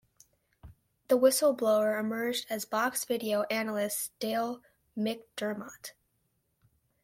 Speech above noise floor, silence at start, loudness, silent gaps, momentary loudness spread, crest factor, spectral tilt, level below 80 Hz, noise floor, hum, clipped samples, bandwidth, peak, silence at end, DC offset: 46 dB; 0.65 s; -30 LUFS; none; 15 LU; 20 dB; -3 dB/octave; -70 dBFS; -76 dBFS; none; under 0.1%; 16.5 kHz; -10 dBFS; 1.15 s; under 0.1%